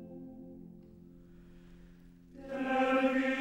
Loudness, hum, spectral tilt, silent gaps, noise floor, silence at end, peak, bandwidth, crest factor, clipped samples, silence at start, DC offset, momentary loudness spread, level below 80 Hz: -31 LUFS; none; -5.5 dB/octave; none; -56 dBFS; 0 s; -16 dBFS; 9.8 kHz; 20 dB; under 0.1%; 0 s; under 0.1%; 26 LU; -62 dBFS